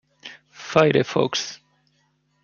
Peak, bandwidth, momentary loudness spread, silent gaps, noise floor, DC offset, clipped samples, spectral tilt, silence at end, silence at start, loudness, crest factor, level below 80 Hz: -2 dBFS; 7.2 kHz; 24 LU; none; -66 dBFS; under 0.1%; under 0.1%; -4.5 dB/octave; 0.9 s; 0.25 s; -21 LUFS; 22 dB; -62 dBFS